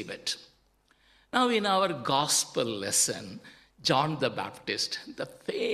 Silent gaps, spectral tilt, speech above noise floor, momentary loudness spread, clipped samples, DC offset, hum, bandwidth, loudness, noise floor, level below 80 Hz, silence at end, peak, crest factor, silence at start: none; -2.5 dB/octave; 37 dB; 13 LU; under 0.1%; under 0.1%; none; 14.5 kHz; -28 LUFS; -67 dBFS; -68 dBFS; 0 s; -8 dBFS; 22 dB; 0 s